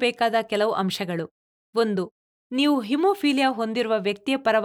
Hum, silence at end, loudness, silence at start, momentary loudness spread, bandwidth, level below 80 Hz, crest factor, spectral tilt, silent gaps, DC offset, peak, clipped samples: none; 0 s; -24 LUFS; 0 s; 9 LU; 17.5 kHz; -70 dBFS; 14 dB; -5 dB/octave; 1.31-1.73 s, 2.11-2.50 s; under 0.1%; -8 dBFS; under 0.1%